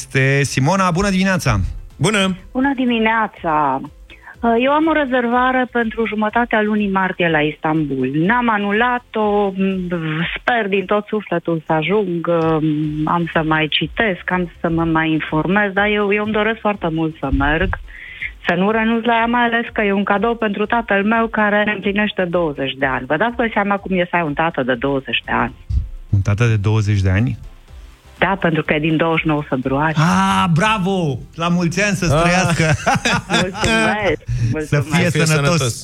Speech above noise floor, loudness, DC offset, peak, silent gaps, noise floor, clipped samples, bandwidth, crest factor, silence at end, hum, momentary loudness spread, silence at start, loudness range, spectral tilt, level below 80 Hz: 22 dB; -17 LUFS; under 0.1%; 0 dBFS; none; -39 dBFS; under 0.1%; 14.5 kHz; 16 dB; 0 s; none; 6 LU; 0 s; 2 LU; -5.5 dB/octave; -36 dBFS